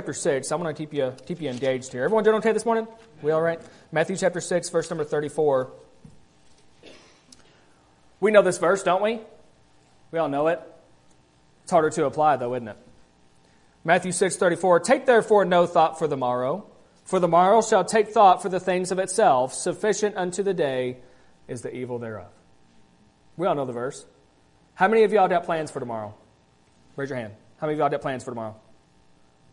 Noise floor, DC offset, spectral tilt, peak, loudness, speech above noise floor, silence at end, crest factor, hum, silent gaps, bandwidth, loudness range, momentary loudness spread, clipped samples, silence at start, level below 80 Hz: -59 dBFS; under 0.1%; -4.5 dB/octave; -2 dBFS; -23 LUFS; 37 dB; 1 s; 22 dB; none; none; 11 kHz; 10 LU; 16 LU; under 0.1%; 0 s; -66 dBFS